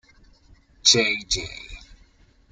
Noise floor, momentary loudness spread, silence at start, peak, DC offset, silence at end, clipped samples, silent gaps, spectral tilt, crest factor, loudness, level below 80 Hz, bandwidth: -56 dBFS; 22 LU; 0.85 s; -4 dBFS; under 0.1%; 0.7 s; under 0.1%; none; -1 dB/octave; 24 dB; -19 LUFS; -46 dBFS; 13 kHz